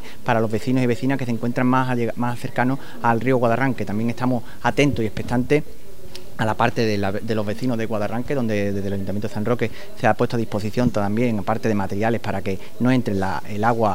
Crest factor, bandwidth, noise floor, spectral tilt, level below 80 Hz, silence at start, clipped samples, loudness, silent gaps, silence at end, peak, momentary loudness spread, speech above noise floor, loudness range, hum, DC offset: 20 dB; 16 kHz; -41 dBFS; -7 dB/octave; -48 dBFS; 0 s; under 0.1%; -22 LUFS; none; 0 s; -2 dBFS; 7 LU; 19 dB; 2 LU; none; 5%